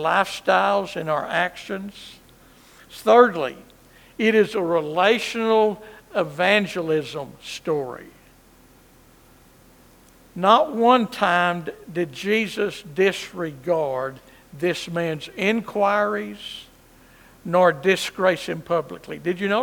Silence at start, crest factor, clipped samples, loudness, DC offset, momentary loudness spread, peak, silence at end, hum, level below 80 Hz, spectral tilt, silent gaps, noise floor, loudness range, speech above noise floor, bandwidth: 0 s; 22 dB; under 0.1%; -22 LUFS; under 0.1%; 15 LU; 0 dBFS; 0 s; none; -60 dBFS; -5 dB/octave; none; -52 dBFS; 5 LU; 31 dB; 19.5 kHz